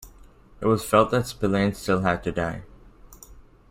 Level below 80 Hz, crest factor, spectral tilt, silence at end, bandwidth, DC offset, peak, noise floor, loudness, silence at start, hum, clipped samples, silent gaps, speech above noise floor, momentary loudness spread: -46 dBFS; 22 dB; -6 dB/octave; 0.3 s; 16 kHz; under 0.1%; -4 dBFS; -50 dBFS; -24 LUFS; 0 s; none; under 0.1%; none; 27 dB; 9 LU